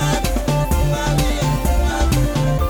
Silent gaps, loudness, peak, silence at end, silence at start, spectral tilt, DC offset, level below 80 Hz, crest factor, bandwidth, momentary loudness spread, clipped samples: none; -19 LUFS; -6 dBFS; 0 s; 0 s; -5.5 dB/octave; under 0.1%; -20 dBFS; 10 dB; over 20 kHz; 2 LU; under 0.1%